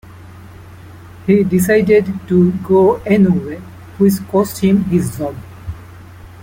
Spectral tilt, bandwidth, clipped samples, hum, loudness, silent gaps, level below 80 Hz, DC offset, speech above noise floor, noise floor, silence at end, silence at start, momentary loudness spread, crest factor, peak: -7.5 dB/octave; 17 kHz; under 0.1%; none; -14 LUFS; none; -44 dBFS; under 0.1%; 23 dB; -36 dBFS; 0 s; 0.1 s; 19 LU; 14 dB; -2 dBFS